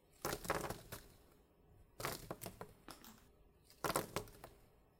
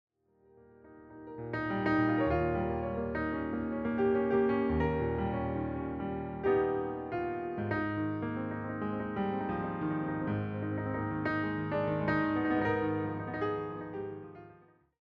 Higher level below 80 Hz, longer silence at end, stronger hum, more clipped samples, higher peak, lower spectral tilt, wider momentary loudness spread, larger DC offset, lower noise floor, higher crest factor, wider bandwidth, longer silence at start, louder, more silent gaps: second, -64 dBFS vs -54 dBFS; second, 0.25 s vs 0.45 s; neither; neither; second, -20 dBFS vs -16 dBFS; second, -3.5 dB/octave vs -6.5 dB/octave; first, 20 LU vs 8 LU; neither; about the same, -68 dBFS vs -65 dBFS; first, 28 dB vs 16 dB; first, 17 kHz vs 5.6 kHz; second, 0.1 s vs 0.85 s; second, -46 LUFS vs -33 LUFS; neither